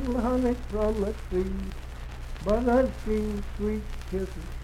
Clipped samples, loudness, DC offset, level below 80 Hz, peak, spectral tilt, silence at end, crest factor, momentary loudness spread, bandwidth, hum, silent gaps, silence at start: under 0.1%; -29 LUFS; under 0.1%; -34 dBFS; -12 dBFS; -7.5 dB/octave; 0 s; 16 dB; 14 LU; 15.5 kHz; none; none; 0 s